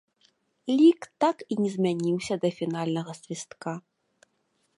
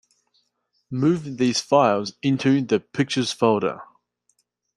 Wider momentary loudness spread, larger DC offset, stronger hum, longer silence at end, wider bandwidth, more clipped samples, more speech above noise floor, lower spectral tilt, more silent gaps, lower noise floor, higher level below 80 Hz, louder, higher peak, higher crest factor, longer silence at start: first, 17 LU vs 6 LU; neither; second, none vs 60 Hz at -50 dBFS; about the same, 1 s vs 0.9 s; about the same, 11.5 kHz vs 11.5 kHz; neither; second, 47 dB vs 51 dB; about the same, -6 dB/octave vs -5.5 dB/octave; neither; about the same, -73 dBFS vs -72 dBFS; second, -74 dBFS vs -66 dBFS; second, -26 LUFS vs -22 LUFS; second, -10 dBFS vs -4 dBFS; about the same, 18 dB vs 18 dB; second, 0.65 s vs 0.9 s